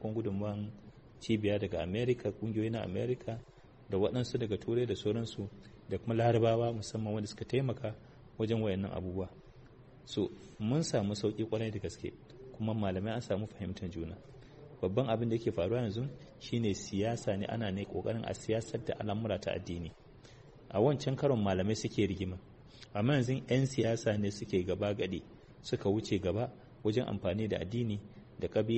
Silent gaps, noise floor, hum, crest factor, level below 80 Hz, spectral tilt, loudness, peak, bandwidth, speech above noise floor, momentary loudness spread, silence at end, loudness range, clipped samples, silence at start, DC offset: none; -56 dBFS; none; 18 dB; -60 dBFS; -6.5 dB/octave; -35 LUFS; -16 dBFS; 8.4 kHz; 22 dB; 12 LU; 0 s; 4 LU; under 0.1%; 0 s; under 0.1%